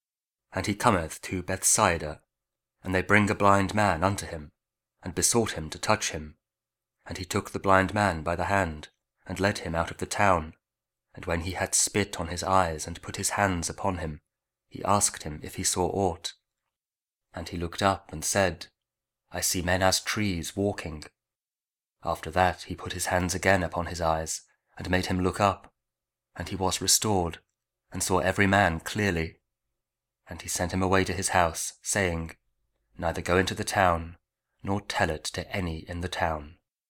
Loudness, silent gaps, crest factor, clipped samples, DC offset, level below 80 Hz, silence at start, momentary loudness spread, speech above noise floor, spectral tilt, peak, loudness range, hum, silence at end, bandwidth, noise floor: -27 LUFS; none; 24 dB; under 0.1%; under 0.1%; -48 dBFS; 0.5 s; 16 LU; over 63 dB; -3.5 dB/octave; -4 dBFS; 4 LU; none; 0.35 s; 19 kHz; under -90 dBFS